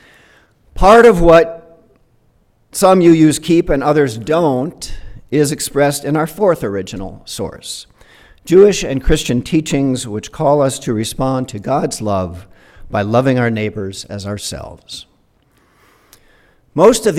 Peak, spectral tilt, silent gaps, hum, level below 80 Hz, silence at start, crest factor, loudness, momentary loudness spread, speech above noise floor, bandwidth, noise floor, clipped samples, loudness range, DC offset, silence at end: 0 dBFS; -5.5 dB/octave; none; none; -32 dBFS; 0.75 s; 14 dB; -14 LUFS; 18 LU; 42 dB; 16.5 kHz; -55 dBFS; 0.1%; 8 LU; under 0.1%; 0 s